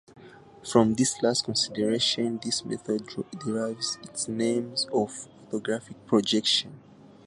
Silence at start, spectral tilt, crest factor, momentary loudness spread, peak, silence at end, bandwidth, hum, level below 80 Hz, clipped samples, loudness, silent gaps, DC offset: 0.15 s; -3.5 dB/octave; 24 dB; 11 LU; -4 dBFS; 0.5 s; 11.5 kHz; none; -64 dBFS; under 0.1%; -27 LUFS; none; under 0.1%